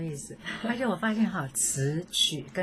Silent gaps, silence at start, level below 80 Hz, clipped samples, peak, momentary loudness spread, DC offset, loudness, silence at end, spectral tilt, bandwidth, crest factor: none; 0 s; -60 dBFS; under 0.1%; -12 dBFS; 11 LU; under 0.1%; -28 LUFS; 0 s; -3 dB/octave; 15.5 kHz; 16 dB